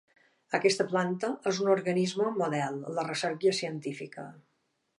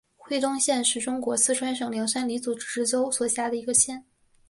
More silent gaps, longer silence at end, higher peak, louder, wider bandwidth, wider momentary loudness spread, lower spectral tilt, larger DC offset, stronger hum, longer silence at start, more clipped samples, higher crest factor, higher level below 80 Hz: neither; about the same, 0.6 s vs 0.5 s; second, -12 dBFS vs -8 dBFS; second, -30 LUFS vs -25 LUFS; about the same, 11.5 kHz vs 11.5 kHz; first, 12 LU vs 8 LU; first, -4.5 dB/octave vs -1.5 dB/octave; neither; neither; first, 0.5 s vs 0.25 s; neither; about the same, 20 dB vs 20 dB; second, -80 dBFS vs -68 dBFS